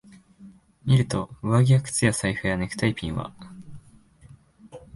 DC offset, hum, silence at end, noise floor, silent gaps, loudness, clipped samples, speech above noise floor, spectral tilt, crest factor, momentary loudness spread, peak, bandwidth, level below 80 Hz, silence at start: under 0.1%; none; 0.15 s; -53 dBFS; none; -24 LUFS; under 0.1%; 30 dB; -5.5 dB/octave; 20 dB; 19 LU; -6 dBFS; 11.5 kHz; -48 dBFS; 0.4 s